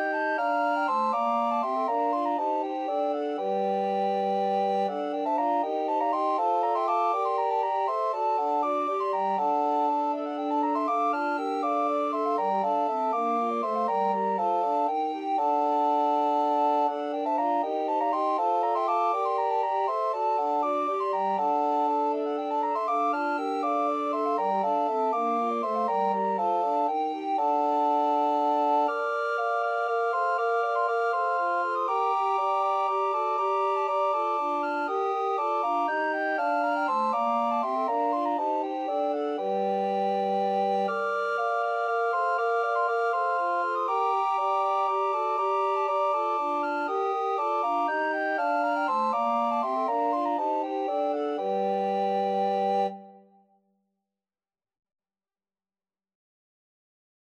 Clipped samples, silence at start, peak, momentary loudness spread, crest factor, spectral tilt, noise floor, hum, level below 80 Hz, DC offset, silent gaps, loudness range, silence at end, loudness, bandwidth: under 0.1%; 0 s; -14 dBFS; 3 LU; 12 dB; -6 dB/octave; under -90 dBFS; none; under -90 dBFS; under 0.1%; none; 2 LU; 4.1 s; -27 LUFS; 9.8 kHz